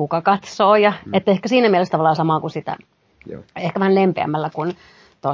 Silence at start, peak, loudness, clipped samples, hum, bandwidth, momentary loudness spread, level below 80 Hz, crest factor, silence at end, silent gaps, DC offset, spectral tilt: 0 s; -2 dBFS; -18 LUFS; under 0.1%; none; 7.6 kHz; 16 LU; -60 dBFS; 16 dB; 0 s; none; under 0.1%; -6.5 dB/octave